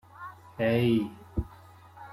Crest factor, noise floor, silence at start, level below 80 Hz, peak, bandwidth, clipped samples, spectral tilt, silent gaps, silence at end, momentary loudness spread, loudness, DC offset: 16 dB; -52 dBFS; 0.2 s; -48 dBFS; -16 dBFS; 14.5 kHz; under 0.1%; -8 dB/octave; none; 0 s; 20 LU; -29 LUFS; under 0.1%